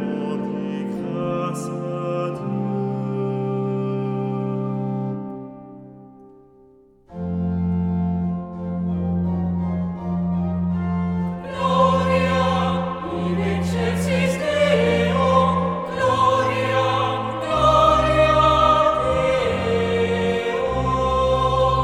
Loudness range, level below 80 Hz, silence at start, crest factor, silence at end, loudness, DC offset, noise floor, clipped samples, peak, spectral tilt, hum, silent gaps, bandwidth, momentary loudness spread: 10 LU; -38 dBFS; 0 s; 16 dB; 0 s; -21 LUFS; under 0.1%; -52 dBFS; under 0.1%; -4 dBFS; -6.5 dB/octave; none; none; 12 kHz; 10 LU